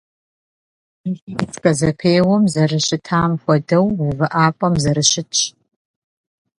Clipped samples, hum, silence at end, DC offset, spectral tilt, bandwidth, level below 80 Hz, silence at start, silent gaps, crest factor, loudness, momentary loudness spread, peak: under 0.1%; none; 1.1 s; under 0.1%; -4.5 dB/octave; 11.5 kHz; -48 dBFS; 1.05 s; 1.22-1.27 s; 18 dB; -17 LUFS; 10 LU; 0 dBFS